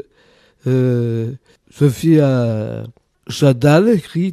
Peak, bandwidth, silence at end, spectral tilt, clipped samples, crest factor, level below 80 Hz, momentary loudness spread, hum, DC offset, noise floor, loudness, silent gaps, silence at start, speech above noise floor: -2 dBFS; 14.5 kHz; 0 s; -7.5 dB/octave; under 0.1%; 14 dB; -52 dBFS; 15 LU; none; under 0.1%; -53 dBFS; -15 LUFS; none; 0.65 s; 38 dB